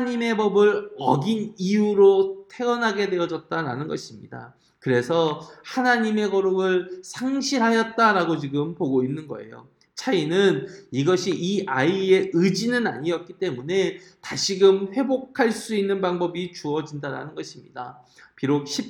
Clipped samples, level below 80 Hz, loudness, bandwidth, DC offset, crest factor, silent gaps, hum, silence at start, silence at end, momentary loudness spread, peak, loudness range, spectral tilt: under 0.1%; -68 dBFS; -23 LUFS; 11.5 kHz; under 0.1%; 18 dB; none; none; 0 s; 0 s; 14 LU; -4 dBFS; 4 LU; -5 dB/octave